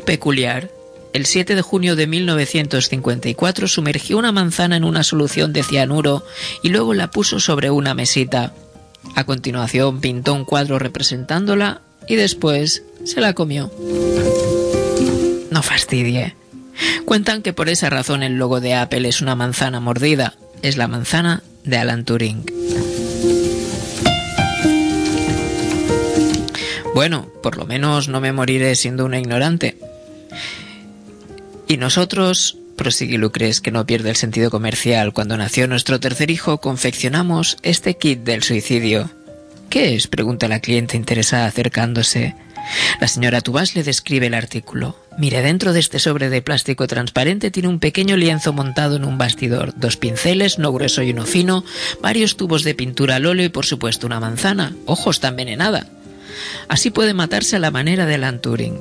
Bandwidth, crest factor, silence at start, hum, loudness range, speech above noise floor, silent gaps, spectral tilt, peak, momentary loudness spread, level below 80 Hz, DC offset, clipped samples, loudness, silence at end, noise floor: 11 kHz; 18 dB; 0 s; none; 2 LU; 22 dB; none; -4 dB/octave; 0 dBFS; 7 LU; -44 dBFS; under 0.1%; under 0.1%; -17 LUFS; 0 s; -40 dBFS